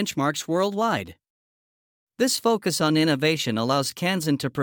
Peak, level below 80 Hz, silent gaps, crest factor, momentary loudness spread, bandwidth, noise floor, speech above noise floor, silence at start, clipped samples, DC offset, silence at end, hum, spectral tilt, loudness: -8 dBFS; -66 dBFS; 1.30-2.07 s; 16 dB; 5 LU; over 20 kHz; under -90 dBFS; over 67 dB; 0 s; under 0.1%; under 0.1%; 0 s; none; -4.5 dB/octave; -23 LUFS